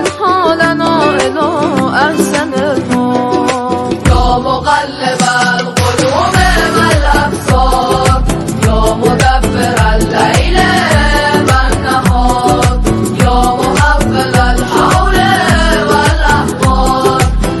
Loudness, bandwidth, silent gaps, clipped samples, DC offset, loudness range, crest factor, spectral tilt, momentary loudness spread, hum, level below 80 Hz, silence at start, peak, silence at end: -10 LUFS; 12.5 kHz; none; 0.4%; under 0.1%; 2 LU; 10 dB; -5 dB/octave; 3 LU; none; -18 dBFS; 0 s; 0 dBFS; 0 s